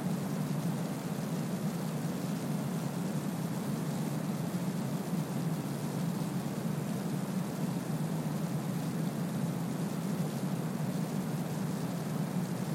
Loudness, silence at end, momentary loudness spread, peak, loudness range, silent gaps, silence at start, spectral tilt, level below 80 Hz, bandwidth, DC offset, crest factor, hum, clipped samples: -35 LUFS; 0 s; 1 LU; -22 dBFS; 0 LU; none; 0 s; -6.5 dB/octave; -70 dBFS; 16.5 kHz; under 0.1%; 12 dB; none; under 0.1%